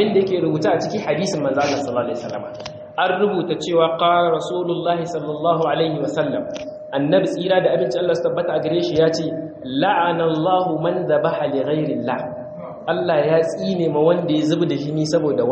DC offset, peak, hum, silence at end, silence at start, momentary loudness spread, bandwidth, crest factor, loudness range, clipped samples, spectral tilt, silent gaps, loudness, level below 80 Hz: under 0.1%; -4 dBFS; none; 0 s; 0 s; 9 LU; 8.4 kHz; 16 dB; 2 LU; under 0.1%; -6 dB/octave; none; -20 LUFS; -60 dBFS